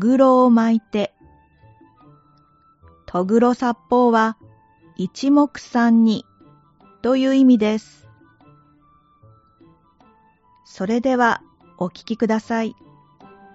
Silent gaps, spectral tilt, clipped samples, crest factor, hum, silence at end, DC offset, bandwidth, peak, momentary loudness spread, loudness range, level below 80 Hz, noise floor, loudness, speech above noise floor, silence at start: none; -5 dB/octave; under 0.1%; 18 dB; none; 0.8 s; under 0.1%; 8 kHz; -2 dBFS; 14 LU; 7 LU; -60 dBFS; -56 dBFS; -18 LUFS; 39 dB; 0 s